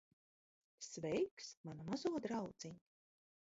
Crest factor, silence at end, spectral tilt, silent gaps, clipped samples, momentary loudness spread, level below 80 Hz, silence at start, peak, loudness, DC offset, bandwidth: 18 dB; 0.65 s; -5.5 dB/octave; 1.31-1.37 s, 1.57-1.64 s; under 0.1%; 13 LU; -78 dBFS; 0.8 s; -28 dBFS; -45 LUFS; under 0.1%; 7.6 kHz